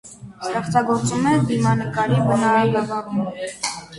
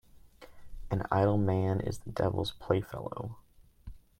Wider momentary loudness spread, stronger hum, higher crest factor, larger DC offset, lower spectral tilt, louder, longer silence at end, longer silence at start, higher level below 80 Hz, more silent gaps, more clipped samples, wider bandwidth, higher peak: second, 10 LU vs 13 LU; neither; second, 14 dB vs 20 dB; neither; second, -6 dB/octave vs -7.5 dB/octave; first, -20 LUFS vs -32 LUFS; second, 0 s vs 0.2 s; about the same, 0.05 s vs 0.15 s; about the same, -50 dBFS vs -52 dBFS; neither; neither; second, 11.5 kHz vs 15 kHz; first, -6 dBFS vs -12 dBFS